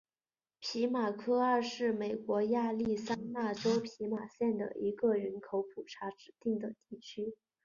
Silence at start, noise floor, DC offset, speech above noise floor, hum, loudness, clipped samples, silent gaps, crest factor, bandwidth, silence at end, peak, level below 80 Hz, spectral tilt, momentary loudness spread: 0.6 s; under -90 dBFS; under 0.1%; over 55 dB; none; -35 LUFS; under 0.1%; none; 16 dB; 7.2 kHz; 0.3 s; -20 dBFS; -74 dBFS; -4.5 dB/octave; 12 LU